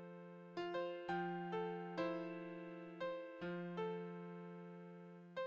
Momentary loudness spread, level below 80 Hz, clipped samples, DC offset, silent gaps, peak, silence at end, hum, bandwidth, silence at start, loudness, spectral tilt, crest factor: 12 LU; -84 dBFS; under 0.1%; under 0.1%; none; -30 dBFS; 0 s; none; 8 kHz; 0 s; -47 LUFS; -7.5 dB/octave; 16 dB